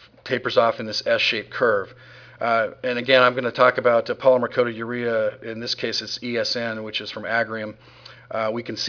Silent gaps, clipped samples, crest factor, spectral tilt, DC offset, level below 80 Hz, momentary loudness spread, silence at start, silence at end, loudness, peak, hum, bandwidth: none; under 0.1%; 22 dB; -4 dB/octave; under 0.1%; -66 dBFS; 10 LU; 0.25 s; 0 s; -22 LUFS; -2 dBFS; none; 5.4 kHz